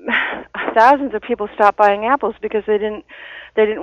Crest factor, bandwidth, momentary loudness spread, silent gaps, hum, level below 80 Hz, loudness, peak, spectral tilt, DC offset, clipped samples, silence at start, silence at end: 16 dB; 7.2 kHz; 12 LU; none; none; -52 dBFS; -17 LUFS; 0 dBFS; -5.5 dB/octave; under 0.1%; under 0.1%; 0.05 s; 0 s